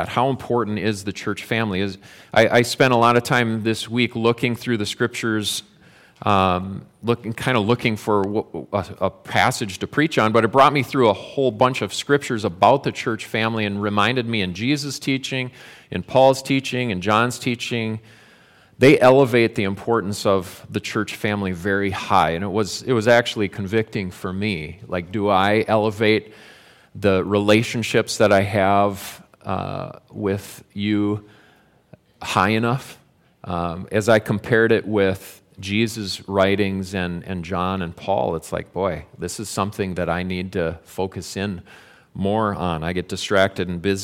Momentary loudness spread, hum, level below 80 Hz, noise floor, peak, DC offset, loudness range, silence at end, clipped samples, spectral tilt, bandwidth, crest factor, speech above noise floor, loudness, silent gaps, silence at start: 12 LU; none; -52 dBFS; -55 dBFS; -2 dBFS; under 0.1%; 6 LU; 0 s; under 0.1%; -5.5 dB/octave; 17 kHz; 18 dB; 35 dB; -20 LUFS; none; 0 s